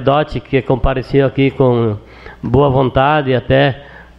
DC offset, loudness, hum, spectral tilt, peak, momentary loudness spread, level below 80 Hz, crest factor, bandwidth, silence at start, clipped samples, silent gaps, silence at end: under 0.1%; -14 LUFS; none; -9 dB/octave; 0 dBFS; 6 LU; -30 dBFS; 12 dB; 5.8 kHz; 0 s; under 0.1%; none; 0.15 s